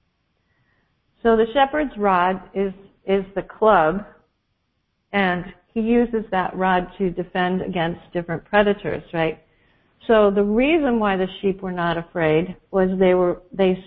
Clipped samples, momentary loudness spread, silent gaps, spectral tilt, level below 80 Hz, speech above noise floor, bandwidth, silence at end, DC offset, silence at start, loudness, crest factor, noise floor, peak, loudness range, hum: under 0.1%; 9 LU; none; -11 dB/octave; -48 dBFS; 51 dB; 4.7 kHz; 0.05 s; under 0.1%; 1.25 s; -21 LUFS; 20 dB; -71 dBFS; -2 dBFS; 3 LU; none